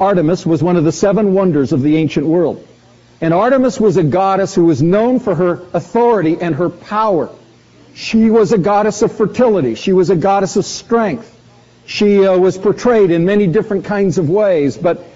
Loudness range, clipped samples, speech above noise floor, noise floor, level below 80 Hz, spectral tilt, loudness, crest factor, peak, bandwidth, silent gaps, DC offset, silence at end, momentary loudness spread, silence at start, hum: 2 LU; under 0.1%; 32 dB; -45 dBFS; -46 dBFS; -6.5 dB/octave; -13 LUFS; 12 dB; -2 dBFS; 8 kHz; none; under 0.1%; 0.1 s; 7 LU; 0 s; none